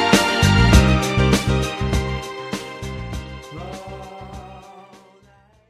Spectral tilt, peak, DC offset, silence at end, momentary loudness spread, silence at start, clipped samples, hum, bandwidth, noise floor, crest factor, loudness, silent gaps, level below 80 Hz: -5 dB/octave; 0 dBFS; under 0.1%; 0.9 s; 22 LU; 0 s; under 0.1%; none; 15 kHz; -53 dBFS; 20 dB; -18 LUFS; none; -26 dBFS